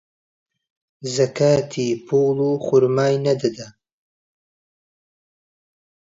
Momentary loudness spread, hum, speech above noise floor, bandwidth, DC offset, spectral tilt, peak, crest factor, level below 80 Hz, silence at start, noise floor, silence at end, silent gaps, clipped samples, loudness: 9 LU; none; over 71 dB; 7.8 kHz; under 0.1%; -6 dB/octave; -4 dBFS; 18 dB; -62 dBFS; 1 s; under -90 dBFS; 2.35 s; none; under 0.1%; -19 LUFS